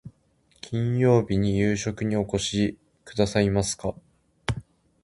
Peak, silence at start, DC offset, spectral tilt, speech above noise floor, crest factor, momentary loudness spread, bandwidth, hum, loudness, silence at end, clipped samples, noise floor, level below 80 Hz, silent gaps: -4 dBFS; 0.05 s; under 0.1%; -5.5 dB/octave; 40 dB; 20 dB; 13 LU; 11.5 kHz; none; -25 LUFS; 0.45 s; under 0.1%; -64 dBFS; -46 dBFS; none